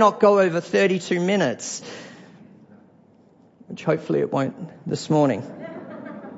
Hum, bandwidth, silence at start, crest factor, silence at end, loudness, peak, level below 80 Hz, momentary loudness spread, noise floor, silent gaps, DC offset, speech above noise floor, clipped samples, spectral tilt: none; 8 kHz; 0 s; 20 dB; 0 s; -22 LUFS; -2 dBFS; -70 dBFS; 19 LU; -54 dBFS; none; under 0.1%; 33 dB; under 0.1%; -5.5 dB/octave